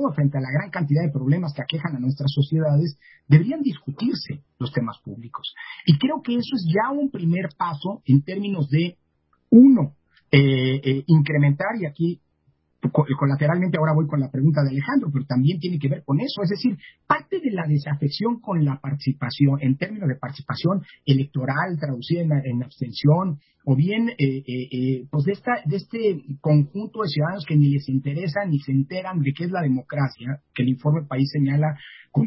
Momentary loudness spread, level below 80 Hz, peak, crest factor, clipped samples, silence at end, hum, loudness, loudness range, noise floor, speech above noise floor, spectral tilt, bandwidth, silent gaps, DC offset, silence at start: 9 LU; -62 dBFS; -2 dBFS; 20 dB; under 0.1%; 0 s; none; -22 LUFS; 5 LU; -67 dBFS; 46 dB; -12 dB/octave; 5.8 kHz; none; under 0.1%; 0 s